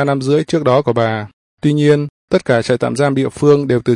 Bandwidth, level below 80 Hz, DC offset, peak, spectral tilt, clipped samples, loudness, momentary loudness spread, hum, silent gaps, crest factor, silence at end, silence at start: 11 kHz; -52 dBFS; under 0.1%; -2 dBFS; -7 dB/octave; under 0.1%; -15 LUFS; 6 LU; none; 1.33-1.57 s, 2.09-2.28 s; 12 dB; 0 s; 0 s